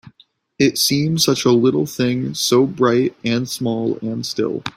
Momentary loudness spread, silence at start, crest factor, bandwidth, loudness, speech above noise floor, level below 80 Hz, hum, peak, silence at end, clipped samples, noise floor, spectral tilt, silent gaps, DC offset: 7 LU; 0.05 s; 16 dB; 16 kHz; -18 LUFS; 37 dB; -56 dBFS; none; -2 dBFS; 0.05 s; under 0.1%; -55 dBFS; -4.5 dB/octave; none; under 0.1%